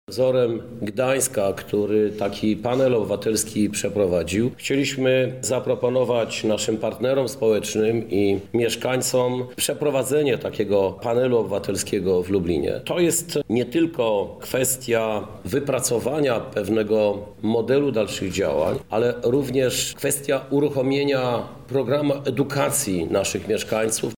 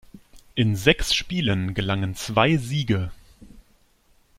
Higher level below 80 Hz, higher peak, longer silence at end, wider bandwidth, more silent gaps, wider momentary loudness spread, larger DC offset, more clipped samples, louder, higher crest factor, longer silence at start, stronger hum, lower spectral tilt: second, -52 dBFS vs -40 dBFS; second, -8 dBFS vs -2 dBFS; second, 0 s vs 0.8 s; first, 19.5 kHz vs 16 kHz; neither; second, 4 LU vs 7 LU; first, 0.2% vs under 0.1%; neither; about the same, -22 LUFS vs -23 LUFS; second, 14 dB vs 22 dB; about the same, 0.1 s vs 0.15 s; neither; about the same, -4.5 dB/octave vs -5 dB/octave